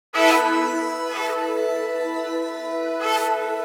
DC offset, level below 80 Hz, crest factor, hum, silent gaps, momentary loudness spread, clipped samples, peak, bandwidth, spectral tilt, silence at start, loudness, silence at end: under 0.1%; -88 dBFS; 18 dB; none; none; 10 LU; under 0.1%; -4 dBFS; over 20 kHz; -0.5 dB/octave; 0.15 s; -22 LUFS; 0 s